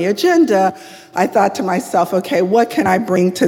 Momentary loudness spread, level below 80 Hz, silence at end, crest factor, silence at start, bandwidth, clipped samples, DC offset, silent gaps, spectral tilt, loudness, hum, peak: 7 LU; -58 dBFS; 0 s; 14 dB; 0 s; 17 kHz; under 0.1%; under 0.1%; none; -5.5 dB/octave; -15 LUFS; none; 0 dBFS